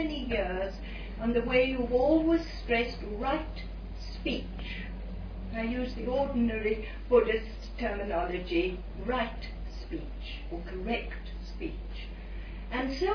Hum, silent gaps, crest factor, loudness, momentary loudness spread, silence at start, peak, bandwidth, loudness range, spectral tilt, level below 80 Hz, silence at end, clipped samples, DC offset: none; none; 20 dB; -32 LUFS; 16 LU; 0 s; -12 dBFS; 5.4 kHz; 8 LU; -7 dB/octave; -40 dBFS; 0 s; under 0.1%; under 0.1%